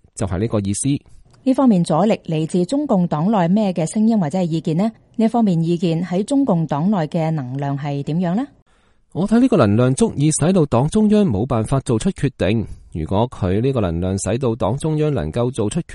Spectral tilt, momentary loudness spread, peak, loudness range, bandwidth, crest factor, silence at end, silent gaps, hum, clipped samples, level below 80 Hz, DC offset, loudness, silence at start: -7 dB/octave; 8 LU; 0 dBFS; 4 LU; 11.5 kHz; 16 dB; 0 s; 8.62-8.66 s; none; under 0.1%; -42 dBFS; under 0.1%; -18 LUFS; 0.15 s